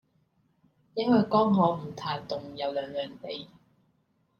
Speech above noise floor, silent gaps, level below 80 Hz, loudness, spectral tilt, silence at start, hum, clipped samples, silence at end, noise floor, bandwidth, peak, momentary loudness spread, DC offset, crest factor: 43 dB; none; -68 dBFS; -28 LUFS; -8 dB/octave; 0.95 s; none; under 0.1%; 0.95 s; -71 dBFS; 6.8 kHz; -12 dBFS; 16 LU; under 0.1%; 18 dB